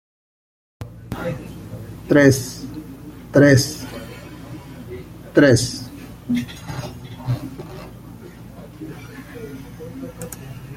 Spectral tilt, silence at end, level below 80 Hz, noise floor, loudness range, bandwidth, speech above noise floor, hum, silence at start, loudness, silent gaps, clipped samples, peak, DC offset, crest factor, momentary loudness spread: -5.5 dB/octave; 0 s; -46 dBFS; -38 dBFS; 14 LU; 16.5 kHz; 23 dB; none; 0.8 s; -18 LUFS; none; under 0.1%; -2 dBFS; under 0.1%; 20 dB; 24 LU